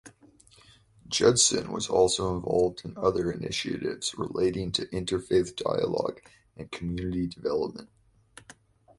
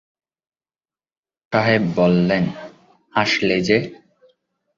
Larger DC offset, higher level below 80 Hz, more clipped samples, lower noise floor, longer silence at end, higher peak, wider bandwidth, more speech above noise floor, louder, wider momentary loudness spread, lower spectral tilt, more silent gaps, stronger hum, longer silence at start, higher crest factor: neither; about the same, -52 dBFS vs -54 dBFS; neither; second, -58 dBFS vs under -90 dBFS; first, 1.15 s vs 0.85 s; second, -8 dBFS vs -2 dBFS; first, 11.5 kHz vs 7.4 kHz; second, 30 dB vs over 72 dB; second, -27 LUFS vs -18 LUFS; about the same, 11 LU vs 9 LU; second, -3.5 dB/octave vs -6 dB/octave; neither; neither; second, 0.05 s vs 1.5 s; about the same, 22 dB vs 20 dB